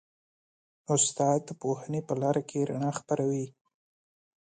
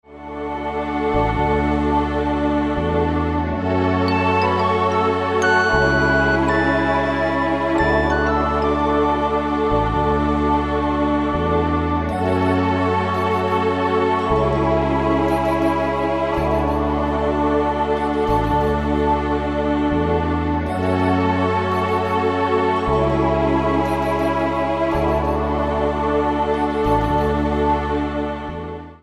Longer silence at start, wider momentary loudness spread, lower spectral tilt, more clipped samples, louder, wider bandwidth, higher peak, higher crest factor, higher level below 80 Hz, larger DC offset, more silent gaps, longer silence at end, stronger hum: first, 0.9 s vs 0.1 s; first, 8 LU vs 3 LU; second, -5 dB/octave vs -7 dB/octave; neither; second, -29 LUFS vs -19 LUFS; second, 9.8 kHz vs 12.5 kHz; second, -12 dBFS vs -2 dBFS; about the same, 18 dB vs 16 dB; second, -74 dBFS vs -30 dBFS; neither; neither; first, 1 s vs 0.05 s; neither